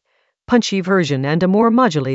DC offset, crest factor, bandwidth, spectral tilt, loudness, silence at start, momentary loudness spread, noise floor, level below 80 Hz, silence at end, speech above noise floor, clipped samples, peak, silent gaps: under 0.1%; 14 dB; 8 kHz; -6 dB/octave; -16 LUFS; 0.5 s; 4 LU; -44 dBFS; -54 dBFS; 0 s; 29 dB; under 0.1%; -2 dBFS; none